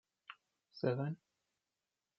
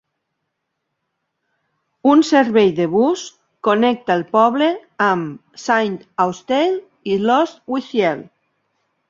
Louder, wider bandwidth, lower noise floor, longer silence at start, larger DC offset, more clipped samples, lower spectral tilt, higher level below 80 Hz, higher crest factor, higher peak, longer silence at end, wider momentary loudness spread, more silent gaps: second, -40 LUFS vs -17 LUFS; second, 6 kHz vs 7.8 kHz; first, under -90 dBFS vs -76 dBFS; second, 0.3 s vs 2.05 s; neither; neither; first, -7 dB/octave vs -5.5 dB/octave; second, -84 dBFS vs -64 dBFS; first, 22 dB vs 16 dB; second, -22 dBFS vs -2 dBFS; first, 1.05 s vs 0.85 s; first, 22 LU vs 10 LU; neither